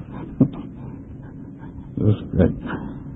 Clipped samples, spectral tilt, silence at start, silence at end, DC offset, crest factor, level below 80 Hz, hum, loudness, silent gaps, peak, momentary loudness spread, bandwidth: under 0.1%; -12 dB/octave; 0 s; 0 s; under 0.1%; 20 dB; -38 dBFS; none; -22 LUFS; none; -4 dBFS; 17 LU; 3.9 kHz